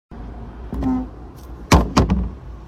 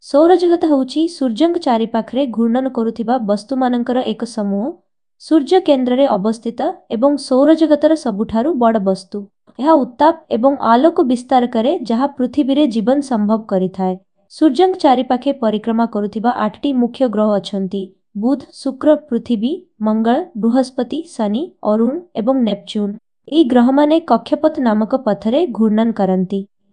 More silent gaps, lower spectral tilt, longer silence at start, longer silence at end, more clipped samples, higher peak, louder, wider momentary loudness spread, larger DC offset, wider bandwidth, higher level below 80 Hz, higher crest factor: neither; about the same, -6 dB/octave vs -7 dB/octave; about the same, 0.1 s vs 0.05 s; second, 0 s vs 0.25 s; neither; about the same, 0 dBFS vs 0 dBFS; second, -20 LUFS vs -16 LUFS; first, 22 LU vs 9 LU; second, under 0.1% vs 0.1%; first, 15.5 kHz vs 10 kHz; first, -26 dBFS vs -60 dBFS; about the same, 20 dB vs 16 dB